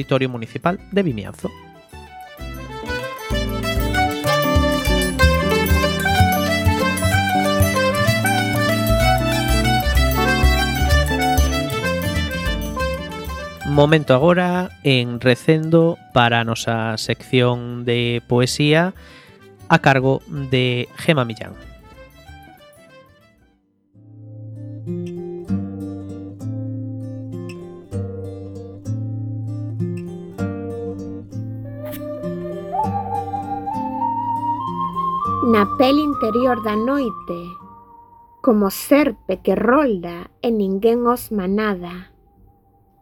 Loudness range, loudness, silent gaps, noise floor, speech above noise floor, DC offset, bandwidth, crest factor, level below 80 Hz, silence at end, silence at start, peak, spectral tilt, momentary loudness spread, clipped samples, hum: 12 LU; -19 LUFS; none; -60 dBFS; 42 dB; under 0.1%; 18 kHz; 20 dB; -30 dBFS; 1 s; 0 s; 0 dBFS; -5.5 dB/octave; 15 LU; under 0.1%; none